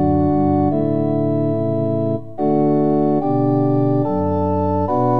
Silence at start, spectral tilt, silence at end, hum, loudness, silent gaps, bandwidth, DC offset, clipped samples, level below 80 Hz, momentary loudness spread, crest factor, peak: 0 s; -12 dB/octave; 0 s; none; -18 LUFS; none; 4.7 kHz; 2%; under 0.1%; -46 dBFS; 3 LU; 12 dB; -6 dBFS